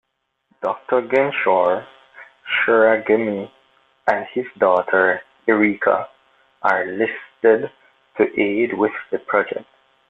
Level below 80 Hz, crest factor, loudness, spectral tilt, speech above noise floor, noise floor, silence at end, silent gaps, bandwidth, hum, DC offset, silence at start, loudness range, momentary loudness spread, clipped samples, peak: -64 dBFS; 18 dB; -19 LUFS; -7 dB/octave; 48 dB; -66 dBFS; 0.45 s; none; 6 kHz; none; under 0.1%; 0.6 s; 2 LU; 11 LU; under 0.1%; -2 dBFS